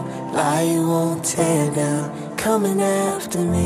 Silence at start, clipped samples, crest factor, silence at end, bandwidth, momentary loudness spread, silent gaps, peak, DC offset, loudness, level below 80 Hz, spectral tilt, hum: 0 s; under 0.1%; 14 dB; 0 s; 16 kHz; 5 LU; none; -6 dBFS; under 0.1%; -20 LUFS; -50 dBFS; -5.5 dB/octave; none